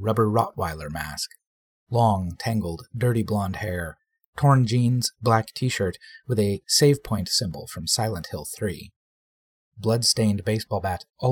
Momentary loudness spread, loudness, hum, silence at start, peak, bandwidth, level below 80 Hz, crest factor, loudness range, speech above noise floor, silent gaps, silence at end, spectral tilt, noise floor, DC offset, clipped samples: 12 LU; -24 LUFS; none; 0 s; -4 dBFS; 17.5 kHz; -50 dBFS; 20 dB; 4 LU; over 66 dB; 1.47-1.87 s, 4.26-4.33 s, 8.96-9.72 s; 0 s; -5 dB/octave; under -90 dBFS; under 0.1%; under 0.1%